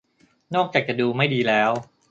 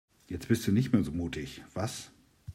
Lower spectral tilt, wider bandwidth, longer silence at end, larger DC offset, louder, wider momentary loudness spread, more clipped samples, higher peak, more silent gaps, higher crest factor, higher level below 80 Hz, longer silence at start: about the same, -6.5 dB/octave vs -6 dB/octave; second, 7.8 kHz vs 16 kHz; first, 0.25 s vs 0 s; neither; first, -22 LUFS vs -32 LUFS; second, 6 LU vs 16 LU; neither; first, -4 dBFS vs -12 dBFS; neither; about the same, 20 dB vs 20 dB; second, -66 dBFS vs -56 dBFS; first, 0.5 s vs 0.3 s